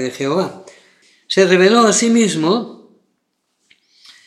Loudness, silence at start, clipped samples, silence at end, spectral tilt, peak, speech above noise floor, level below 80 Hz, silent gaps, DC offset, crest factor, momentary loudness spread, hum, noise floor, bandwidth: -14 LUFS; 0 s; under 0.1%; 1.5 s; -4 dB/octave; 0 dBFS; 55 dB; -78 dBFS; none; under 0.1%; 16 dB; 10 LU; none; -69 dBFS; 12.5 kHz